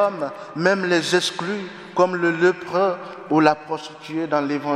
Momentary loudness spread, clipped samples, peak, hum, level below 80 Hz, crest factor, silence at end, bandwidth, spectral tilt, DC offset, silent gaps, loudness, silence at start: 12 LU; under 0.1%; -2 dBFS; none; -68 dBFS; 20 dB; 0 s; 13 kHz; -4.5 dB/octave; under 0.1%; none; -21 LUFS; 0 s